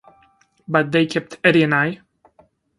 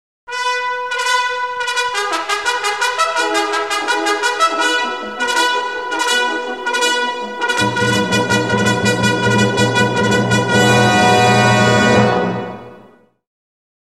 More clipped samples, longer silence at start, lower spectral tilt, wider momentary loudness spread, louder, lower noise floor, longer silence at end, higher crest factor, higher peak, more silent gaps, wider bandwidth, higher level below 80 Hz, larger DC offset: neither; first, 0.7 s vs 0.3 s; first, -6.5 dB/octave vs -4 dB/octave; about the same, 8 LU vs 9 LU; second, -18 LUFS vs -15 LUFS; first, -58 dBFS vs -46 dBFS; second, 0.85 s vs 1.05 s; about the same, 20 dB vs 16 dB; about the same, 0 dBFS vs 0 dBFS; neither; second, 11.5 kHz vs 14.5 kHz; second, -62 dBFS vs -50 dBFS; second, under 0.1% vs 0.4%